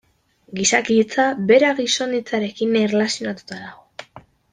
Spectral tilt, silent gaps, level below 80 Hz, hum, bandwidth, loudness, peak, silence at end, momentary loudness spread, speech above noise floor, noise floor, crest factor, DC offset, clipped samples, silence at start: -3.5 dB/octave; none; -62 dBFS; none; 10 kHz; -18 LUFS; -2 dBFS; 0.35 s; 20 LU; 38 dB; -57 dBFS; 18 dB; under 0.1%; under 0.1%; 0.5 s